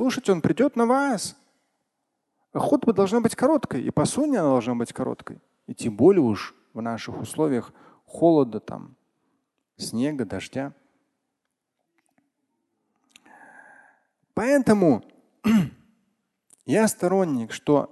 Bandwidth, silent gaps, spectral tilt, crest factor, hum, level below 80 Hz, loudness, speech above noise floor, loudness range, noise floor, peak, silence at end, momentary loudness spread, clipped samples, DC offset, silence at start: 12.5 kHz; none; -6 dB/octave; 20 dB; none; -58 dBFS; -23 LUFS; 58 dB; 10 LU; -81 dBFS; -6 dBFS; 0.05 s; 15 LU; under 0.1%; under 0.1%; 0 s